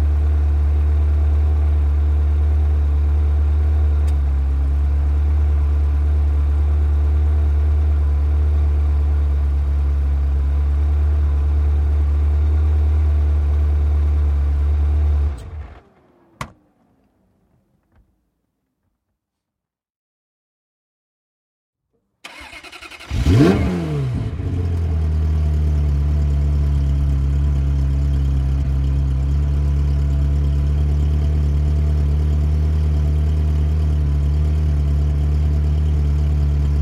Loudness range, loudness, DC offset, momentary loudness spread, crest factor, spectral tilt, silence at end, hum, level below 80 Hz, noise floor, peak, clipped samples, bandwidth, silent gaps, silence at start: 3 LU; -19 LUFS; under 0.1%; 3 LU; 16 dB; -8.5 dB/octave; 0 s; none; -18 dBFS; -83 dBFS; 0 dBFS; under 0.1%; 5.4 kHz; 19.90-21.73 s; 0 s